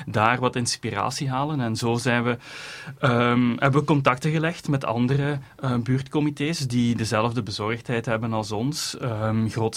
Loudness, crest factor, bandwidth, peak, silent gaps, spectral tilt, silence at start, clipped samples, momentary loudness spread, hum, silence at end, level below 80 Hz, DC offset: -24 LUFS; 20 dB; 15.5 kHz; -2 dBFS; none; -5.5 dB/octave; 0 s; under 0.1%; 7 LU; none; 0 s; -54 dBFS; under 0.1%